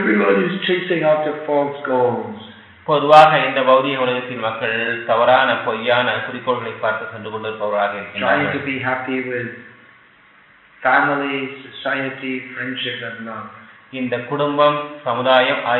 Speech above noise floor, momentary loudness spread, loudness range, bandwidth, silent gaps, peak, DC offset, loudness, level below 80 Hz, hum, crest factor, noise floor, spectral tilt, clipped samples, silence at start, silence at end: 32 dB; 13 LU; 7 LU; 8 kHz; none; 0 dBFS; under 0.1%; -18 LUFS; -66 dBFS; none; 18 dB; -50 dBFS; -2.5 dB/octave; under 0.1%; 0 s; 0 s